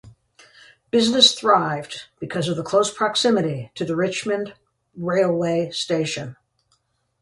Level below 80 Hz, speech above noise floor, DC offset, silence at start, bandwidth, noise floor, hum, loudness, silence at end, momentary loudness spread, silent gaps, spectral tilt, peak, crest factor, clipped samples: -62 dBFS; 47 dB; under 0.1%; 0.05 s; 11.5 kHz; -68 dBFS; none; -20 LUFS; 0.9 s; 16 LU; none; -4 dB/octave; 0 dBFS; 22 dB; under 0.1%